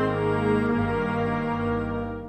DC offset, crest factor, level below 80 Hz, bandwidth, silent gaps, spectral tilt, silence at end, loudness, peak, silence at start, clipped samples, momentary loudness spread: under 0.1%; 14 dB; -44 dBFS; 8.8 kHz; none; -8.5 dB/octave; 0 s; -25 LUFS; -12 dBFS; 0 s; under 0.1%; 4 LU